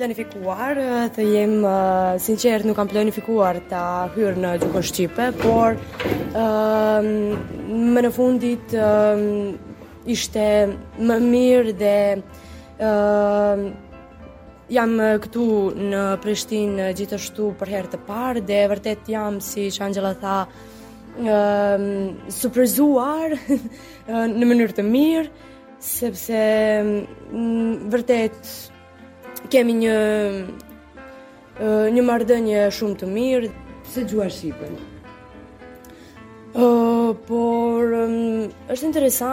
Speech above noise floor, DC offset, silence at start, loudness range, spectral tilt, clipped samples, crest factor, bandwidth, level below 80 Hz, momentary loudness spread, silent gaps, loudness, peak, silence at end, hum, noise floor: 25 dB; under 0.1%; 0 s; 4 LU; -5.5 dB/octave; under 0.1%; 16 dB; 17 kHz; -48 dBFS; 12 LU; none; -20 LUFS; -4 dBFS; 0 s; none; -44 dBFS